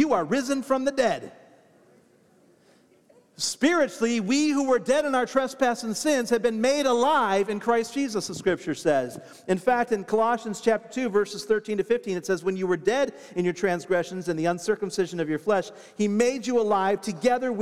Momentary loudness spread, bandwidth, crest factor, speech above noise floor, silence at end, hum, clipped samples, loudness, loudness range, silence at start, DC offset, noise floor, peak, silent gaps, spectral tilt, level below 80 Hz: 6 LU; 15 kHz; 18 dB; 35 dB; 0 s; none; under 0.1%; -25 LUFS; 4 LU; 0 s; 0.1%; -59 dBFS; -8 dBFS; none; -4.5 dB/octave; -64 dBFS